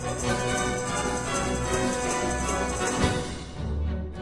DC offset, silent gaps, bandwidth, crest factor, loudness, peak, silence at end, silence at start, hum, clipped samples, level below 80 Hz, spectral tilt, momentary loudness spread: 0.1%; none; 11.5 kHz; 18 dB; -27 LUFS; -10 dBFS; 0 s; 0 s; none; under 0.1%; -36 dBFS; -4 dB/octave; 5 LU